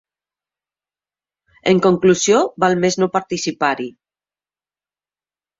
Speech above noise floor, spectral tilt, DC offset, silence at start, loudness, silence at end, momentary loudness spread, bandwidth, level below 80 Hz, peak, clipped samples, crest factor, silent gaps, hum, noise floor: over 74 dB; -4.5 dB/octave; under 0.1%; 1.65 s; -17 LUFS; 1.7 s; 10 LU; 7.8 kHz; -60 dBFS; -2 dBFS; under 0.1%; 18 dB; none; 50 Hz at -50 dBFS; under -90 dBFS